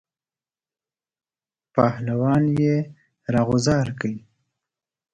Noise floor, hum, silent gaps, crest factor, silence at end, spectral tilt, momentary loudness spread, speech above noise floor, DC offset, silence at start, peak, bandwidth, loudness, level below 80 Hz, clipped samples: under -90 dBFS; none; none; 20 dB; 0.95 s; -7 dB/octave; 12 LU; over 70 dB; under 0.1%; 1.75 s; -4 dBFS; 9.2 kHz; -22 LUFS; -52 dBFS; under 0.1%